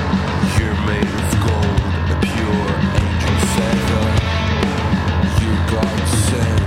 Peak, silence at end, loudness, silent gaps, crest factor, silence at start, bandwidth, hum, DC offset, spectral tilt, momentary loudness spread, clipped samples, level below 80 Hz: -4 dBFS; 0 s; -17 LUFS; none; 14 dB; 0 s; 15.5 kHz; none; under 0.1%; -5.5 dB/octave; 2 LU; under 0.1%; -26 dBFS